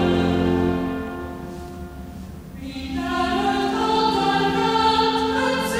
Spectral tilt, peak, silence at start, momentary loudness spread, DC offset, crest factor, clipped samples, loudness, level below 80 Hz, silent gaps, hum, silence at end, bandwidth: -5.5 dB/octave; -8 dBFS; 0 s; 17 LU; under 0.1%; 14 dB; under 0.1%; -21 LUFS; -40 dBFS; none; none; 0 s; 16 kHz